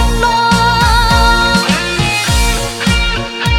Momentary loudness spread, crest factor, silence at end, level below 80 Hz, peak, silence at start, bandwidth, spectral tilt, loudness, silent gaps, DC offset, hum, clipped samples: 5 LU; 12 dB; 0 s; -18 dBFS; 0 dBFS; 0 s; 18 kHz; -3.5 dB/octave; -11 LUFS; none; under 0.1%; none; under 0.1%